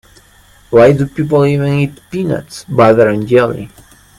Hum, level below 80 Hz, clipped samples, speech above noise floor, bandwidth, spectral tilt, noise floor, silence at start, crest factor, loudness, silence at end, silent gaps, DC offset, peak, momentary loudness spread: none; -44 dBFS; under 0.1%; 34 dB; 14 kHz; -7.5 dB/octave; -45 dBFS; 0.7 s; 12 dB; -12 LUFS; 0.5 s; none; under 0.1%; 0 dBFS; 12 LU